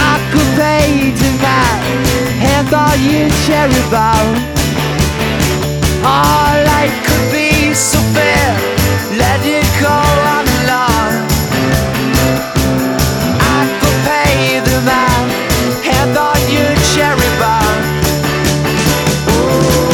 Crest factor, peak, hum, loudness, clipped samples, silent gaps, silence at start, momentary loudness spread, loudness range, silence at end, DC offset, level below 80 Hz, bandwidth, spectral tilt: 12 dB; 0 dBFS; none; -11 LUFS; under 0.1%; none; 0 s; 3 LU; 1 LU; 0 s; under 0.1%; -24 dBFS; 19.5 kHz; -4.5 dB/octave